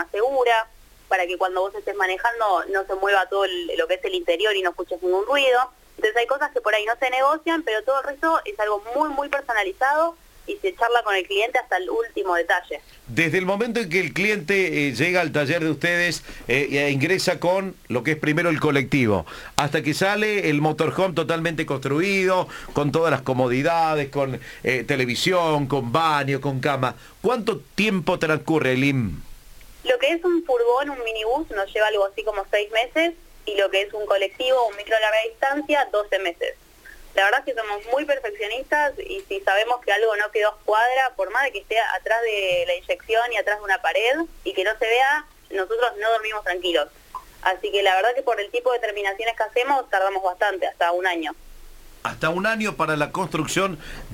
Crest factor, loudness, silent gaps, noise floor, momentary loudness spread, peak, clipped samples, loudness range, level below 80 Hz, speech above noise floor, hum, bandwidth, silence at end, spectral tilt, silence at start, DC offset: 22 dB; -22 LUFS; none; -45 dBFS; 6 LU; 0 dBFS; under 0.1%; 2 LU; -50 dBFS; 23 dB; none; 17 kHz; 0 s; -4.5 dB/octave; 0 s; under 0.1%